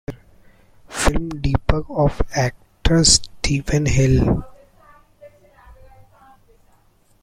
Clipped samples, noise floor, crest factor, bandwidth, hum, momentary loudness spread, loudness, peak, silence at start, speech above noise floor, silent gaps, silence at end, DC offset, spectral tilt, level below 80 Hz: under 0.1%; -56 dBFS; 20 dB; 15 kHz; none; 11 LU; -19 LUFS; 0 dBFS; 0.1 s; 39 dB; none; 1.5 s; under 0.1%; -4 dB/octave; -28 dBFS